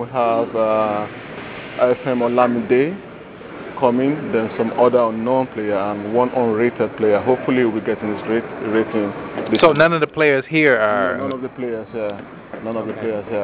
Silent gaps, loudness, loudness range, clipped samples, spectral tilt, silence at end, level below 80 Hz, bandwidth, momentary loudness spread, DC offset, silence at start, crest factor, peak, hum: none; -18 LUFS; 3 LU; under 0.1%; -10 dB/octave; 0 s; -54 dBFS; 4 kHz; 15 LU; under 0.1%; 0 s; 18 dB; -2 dBFS; none